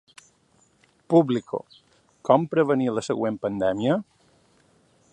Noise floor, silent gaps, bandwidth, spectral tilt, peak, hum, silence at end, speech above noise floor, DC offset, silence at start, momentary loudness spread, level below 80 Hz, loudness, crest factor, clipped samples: -63 dBFS; none; 11 kHz; -7 dB/octave; -4 dBFS; none; 1.1 s; 40 dB; under 0.1%; 1.1 s; 9 LU; -64 dBFS; -24 LUFS; 22 dB; under 0.1%